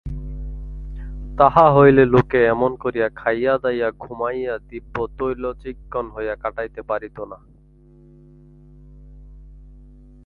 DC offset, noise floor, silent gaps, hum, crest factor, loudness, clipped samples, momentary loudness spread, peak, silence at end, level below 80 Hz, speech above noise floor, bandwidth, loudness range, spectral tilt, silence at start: under 0.1%; -49 dBFS; none; 50 Hz at -40 dBFS; 20 dB; -19 LUFS; under 0.1%; 22 LU; 0 dBFS; 0.5 s; -38 dBFS; 31 dB; 5 kHz; 15 LU; -9.5 dB/octave; 0.05 s